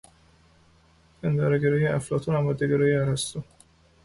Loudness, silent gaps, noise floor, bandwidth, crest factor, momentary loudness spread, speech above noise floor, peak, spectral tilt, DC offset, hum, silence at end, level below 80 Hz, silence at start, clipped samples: -25 LUFS; none; -59 dBFS; 11.5 kHz; 14 dB; 9 LU; 35 dB; -12 dBFS; -6.5 dB/octave; under 0.1%; none; 0.6 s; -54 dBFS; 1.25 s; under 0.1%